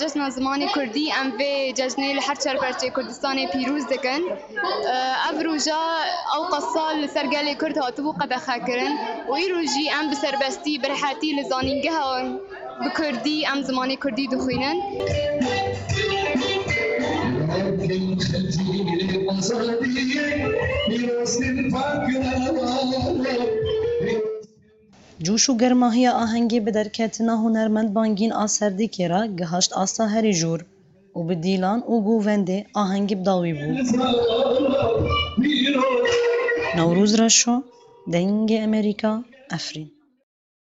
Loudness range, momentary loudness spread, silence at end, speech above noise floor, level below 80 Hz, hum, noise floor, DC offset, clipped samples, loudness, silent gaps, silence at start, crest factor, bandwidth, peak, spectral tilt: 4 LU; 6 LU; 0.75 s; 32 dB; -48 dBFS; none; -54 dBFS; under 0.1%; under 0.1%; -22 LUFS; none; 0 s; 20 dB; 8.2 kHz; -4 dBFS; -4 dB/octave